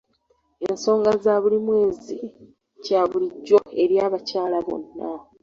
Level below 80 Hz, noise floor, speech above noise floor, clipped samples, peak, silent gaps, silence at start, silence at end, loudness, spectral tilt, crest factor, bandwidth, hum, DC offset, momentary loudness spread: -62 dBFS; -66 dBFS; 45 dB; under 0.1%; -4 dBFS; none; 0.6 s; 0.2 s; -21 LUFS; -5.5 dB/octave; 18 dB; 7.4 kHz; none; under 0.1%; 14 LU